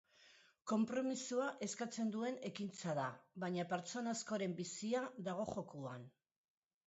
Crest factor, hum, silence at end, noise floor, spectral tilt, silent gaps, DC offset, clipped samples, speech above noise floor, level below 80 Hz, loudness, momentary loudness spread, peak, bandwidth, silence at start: 16 dB; none; 0.8 s; -68 dBFS; -5 dB/octave; none; under 0.1%; under 0.1%; 26 dB; -82 dBFS; -43 LUFS; 8 LU; -26 dBFS; 8 kHz; 0.2 s